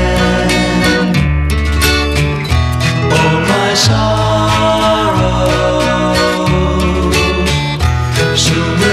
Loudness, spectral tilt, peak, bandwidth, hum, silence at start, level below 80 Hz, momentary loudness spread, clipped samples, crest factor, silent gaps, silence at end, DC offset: -12 LUFS; -5 dB/octave; 0 dBFS; 15 kHz; none; 0 s; -20 dBFS; 3 LU; under 0.1%; 12 dB; none; 0 s; under 0.1%